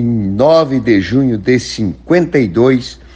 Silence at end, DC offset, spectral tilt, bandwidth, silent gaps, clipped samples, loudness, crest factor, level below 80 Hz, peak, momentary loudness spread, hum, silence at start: 0.2 s; under 0.1%; -6.5 dB/octave; 9 kHz; none; under 0.1%; -12 LUFS; 12 dB; -40 dBFS; 0 dBFS; 6 LU; none; 0 s